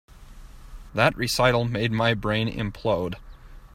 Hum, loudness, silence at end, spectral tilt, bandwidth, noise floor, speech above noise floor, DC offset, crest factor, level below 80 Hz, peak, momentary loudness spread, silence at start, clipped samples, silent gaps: none; -24 LUFS; 0.1 s; -5 dB/octave; 16 kHz; -44 dBFS; 20 dB; under 0.1%; 22 dB; -44 dBFS; -4 dBFS; 10 LU; 0.15 s; under 0.1%; none